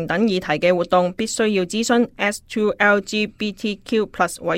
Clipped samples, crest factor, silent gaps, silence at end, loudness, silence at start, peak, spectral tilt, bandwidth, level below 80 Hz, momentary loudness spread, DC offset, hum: under 0.1%; 16 dB; none; 0 s; -20 LUFS; 0 s; -2 dBFS; -4.5 dB/octave; 16 kHz; -52 dBFS; 7 LU; under 0.1%; none